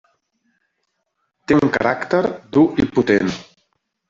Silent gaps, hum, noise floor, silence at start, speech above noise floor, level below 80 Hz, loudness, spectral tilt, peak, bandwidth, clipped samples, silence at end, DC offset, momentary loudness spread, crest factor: none; none; -73 dBFS; 1.5 s; 56 dB; -50 dBFS; -18 LUFS; -7 dB/octave; -2 dBFS; 7.6 kHz; under 0.1%; 0.65 s; under 0.1%; 8 LU; 18 dB